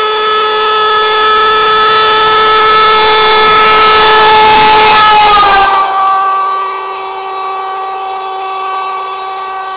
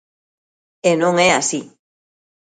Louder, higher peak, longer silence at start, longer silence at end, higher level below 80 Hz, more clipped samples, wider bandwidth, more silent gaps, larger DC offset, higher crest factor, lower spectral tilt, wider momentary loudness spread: first, -6 LUFS vs -16 LUFS; second, -4 dBFS vs 0 dBFS; second, 0 s vs 0.85 s; second, 0 s vs 0.85 s; first, -38 dBFS vs -62 dBFS; neither; second, 4 kHz vs 9.6 kHz; neither; neither; second, 4 dB vs 20 dB; first, -6 dB/octave vs -3.5 dB/octave; first, 13 LU vs 8 LU